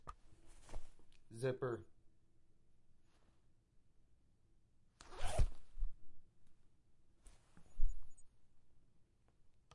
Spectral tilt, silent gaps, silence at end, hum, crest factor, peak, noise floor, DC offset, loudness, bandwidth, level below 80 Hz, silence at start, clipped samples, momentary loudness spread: -6 dB/octave; none; 0.25 s; none; 22 dB; -20 dBFS; -70 dBFS; under 0.1%; -46 LUFS; 11.5 kHz; -48 dBFS; 0.05 s; under 0.1%; 23 LU